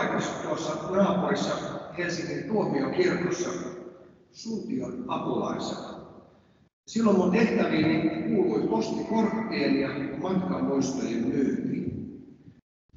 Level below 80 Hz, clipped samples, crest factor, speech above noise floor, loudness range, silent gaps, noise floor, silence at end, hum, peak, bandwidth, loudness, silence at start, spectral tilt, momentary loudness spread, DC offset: -60 dBFS; under 0.1%; 18 dB; 32 dB; 7 LU; 6.73-6.83 s; -58 dBFS; 0.45 s; none; -10 dBFS; 7.8 kHz; -27 LUFS; 0 s; -6 dB/octave; 12 LU; under 0.1%